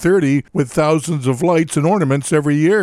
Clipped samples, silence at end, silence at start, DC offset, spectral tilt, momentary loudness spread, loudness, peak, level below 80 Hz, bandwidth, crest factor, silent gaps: under 0.1%; 0 s; 0 s; under 0.1%; -6.5 dB/octave; 3 LU; -16 LUFS; -2 dBFS; -50 dBFS; 14 kHz; 12 dB; none